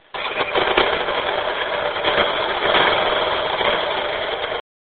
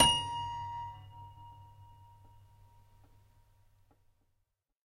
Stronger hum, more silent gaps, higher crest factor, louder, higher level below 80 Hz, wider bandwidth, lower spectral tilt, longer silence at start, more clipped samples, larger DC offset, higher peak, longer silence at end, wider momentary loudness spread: neither; neither; second, 20 dB vs 28 dB; first, -19 LUFS vs -34 LUFS; first, -46 dBFS vs -56 dBFS; second, 4.7 kHz vs 15.5 kHz; second, 0.5 dB/octave vs -1.5 dB/octave; first, 0.15 s vs 0 s; neither; neither; first, 0 dBFS vs -10 dBFS; second, 0.35 s vs 2.95 s; second, 7 LU vs 26 LU